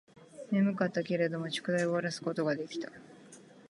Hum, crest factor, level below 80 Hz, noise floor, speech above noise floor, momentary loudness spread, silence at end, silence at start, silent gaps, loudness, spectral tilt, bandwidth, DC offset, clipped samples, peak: none; 18 dB; -82 dBFS; -55 dBFS; 23 dB; 20 LU; 0.1 s; 0.15 s; none; -32 LUFS; -6 dB/octave; 11.5 kHz; under 0.1%; under 0.1%; -14 dBFS